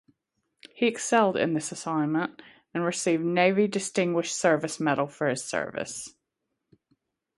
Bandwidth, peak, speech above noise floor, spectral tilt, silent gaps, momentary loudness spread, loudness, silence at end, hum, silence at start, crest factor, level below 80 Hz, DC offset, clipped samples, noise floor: 11.5 kHz; -8 dBFS; 56 dB; -4.5 dB/octave; none; 11 LU; -26 LUFS; 1.3 s; none; 0.75 s; 20 dB; -72 dBFS; under 0.1%; under 0.1%; -82 dBFS